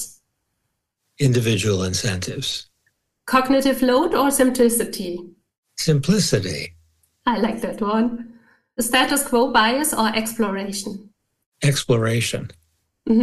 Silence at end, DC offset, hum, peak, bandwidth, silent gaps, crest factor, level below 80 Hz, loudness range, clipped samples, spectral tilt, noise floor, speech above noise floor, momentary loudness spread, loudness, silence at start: 0 s; under 0.1%; none; -6 dBFS; 13 kHz; 5.58-5.63 s, 11.46-11.52 s; 14 dB; -50 dBFS; 3 LU; under 0.1%; -4.5 dB/octave; -75 dBFS; 56 dB; 15 LU; -20 LUFS; 0 s